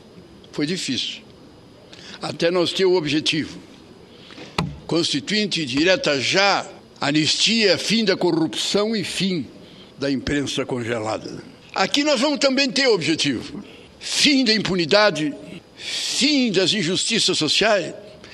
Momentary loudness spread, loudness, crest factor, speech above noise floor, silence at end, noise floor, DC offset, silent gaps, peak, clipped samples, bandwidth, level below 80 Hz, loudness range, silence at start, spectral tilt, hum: 17 LU; -19 LUFS; 22 dB; 26 dB; 0 s; -46 dBFS; under 0.1%; none; 0 dBFS; under 0.1%; 13.5 kHz; -54 dBFS; 5 LU; 0.15 s; -3.5 dB/octave; none